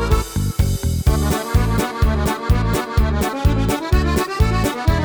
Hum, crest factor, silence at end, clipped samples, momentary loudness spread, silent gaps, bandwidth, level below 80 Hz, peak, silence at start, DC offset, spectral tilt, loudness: none; 14 dB; 0 s; under 0.1%; 2 LU; none; over 20 kHz; -20 dBFS; -2 dBFS; 0 s; under 0.1%; -6 dB/octave; -19 LUFS